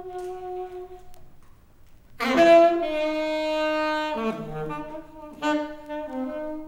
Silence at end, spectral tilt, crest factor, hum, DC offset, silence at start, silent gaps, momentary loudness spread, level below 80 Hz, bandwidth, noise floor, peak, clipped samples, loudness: 0 s; -5 dB/octave; 18 dB; none; under 0.1%; 0 s; none; 21 LU; -52 dBFS; 13.5 kHz; -50 dBFS; -6 dBFS; under 0.1%; -24 LUFS